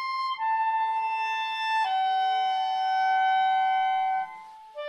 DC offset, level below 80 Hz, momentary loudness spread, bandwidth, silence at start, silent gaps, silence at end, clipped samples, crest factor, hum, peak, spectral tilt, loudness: under 0.1%; -84 dBFS; 6 LU; 9.4 kHz; 0 s; none; 0 s; under 0.1%; 10 dB; none; -16 dBFS; 0.5 dB/octave; -26 LUFS